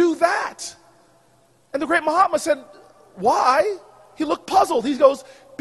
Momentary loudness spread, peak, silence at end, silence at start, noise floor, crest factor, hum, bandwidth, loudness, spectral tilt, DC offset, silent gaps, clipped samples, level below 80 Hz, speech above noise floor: 15 LU; 0 dBFS; 0.4 s; 0 s; -58 dBFS; 20 dB; none; 12 kHz; -20 LUFS; -3.5 dB/octave; under 0.1%; none; under 0.1%; -60 dBFS; 39 dB